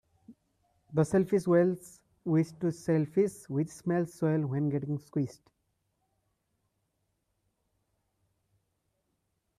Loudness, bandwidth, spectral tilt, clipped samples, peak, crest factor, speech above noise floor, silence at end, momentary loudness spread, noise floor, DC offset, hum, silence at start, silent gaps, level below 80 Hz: -30 LUFS; 13.5 kHz; -8.5 dB/octave; under 0.1%; -14 dBFS; 18 dB; 50 dB; 4.25 s; 9 LU; -79 dBFS; under 0.1%; none; 0.3 s; none; -70 dBFS